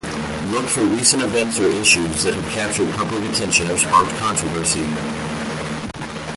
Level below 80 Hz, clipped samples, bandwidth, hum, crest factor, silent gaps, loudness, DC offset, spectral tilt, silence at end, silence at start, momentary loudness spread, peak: -42 dBFS; under 0.1%; 12 kHz; none; 20 dB; none; -18 LUFS; under 0.1%; -3 dB/octave; 0 s; 0.05 s; 11 LU; 0 dBFS